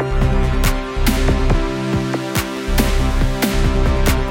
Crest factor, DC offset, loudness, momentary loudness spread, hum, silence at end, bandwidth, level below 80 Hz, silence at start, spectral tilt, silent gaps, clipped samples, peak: 14 dB; under 0.1%; -19 LUFS; 3 LU; none; 0 s; 17 kHz; -18 dBFS; 0 s; -5.5 dB/octave; none; under 0.1%; -2 dBFS